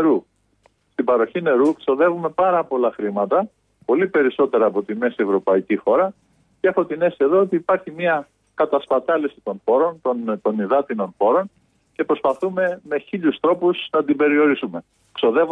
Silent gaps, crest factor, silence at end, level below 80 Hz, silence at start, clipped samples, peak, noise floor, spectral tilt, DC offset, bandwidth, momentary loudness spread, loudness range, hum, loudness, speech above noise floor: none; 12 dB; 0 s; -66 dBFS; 0 s; under 0.1%; -6 dBFS; -61 dBFS; -7.5 dB/octave; under 0.1%; 9.2 kHz; 8 LU; 2 LU; none; -20 LUFS; 42 dB